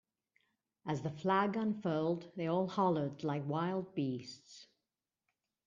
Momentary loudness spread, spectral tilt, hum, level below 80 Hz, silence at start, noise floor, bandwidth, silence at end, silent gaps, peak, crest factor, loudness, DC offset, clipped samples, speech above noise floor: 16 LU; -7.5 dB/octave; none; -78 dBFS; 0.85 s; under -90 dBFS; 7.6 kHz; 1 s; none; -18 dBFS; 20 dB; -36 LUFS; under 0.1%; under 0.1%; over 54 dB